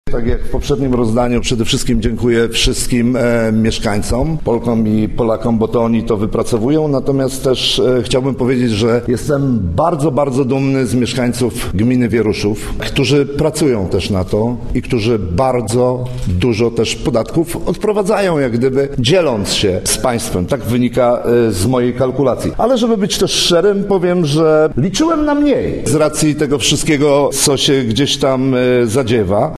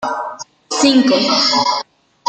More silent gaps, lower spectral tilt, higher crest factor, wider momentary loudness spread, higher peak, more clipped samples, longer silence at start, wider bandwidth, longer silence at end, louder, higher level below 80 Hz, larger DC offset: neither; first, -5 dB/octave vs -2.5 dB/octave; about the same, 14 dB vs 14 dB; second, 4 LU vs 14 LU; about the same, 0 dBFS vs -2 dBFS; neither; about the same, 0.05 s vs 0 s; first, 13.5 kHz vs 9.4 kHz; second, 0 s vs 0.45 s; about the same, -14 LUFS vs -14 LUFS; first, -28 dBFS vs -62 dBFS; neither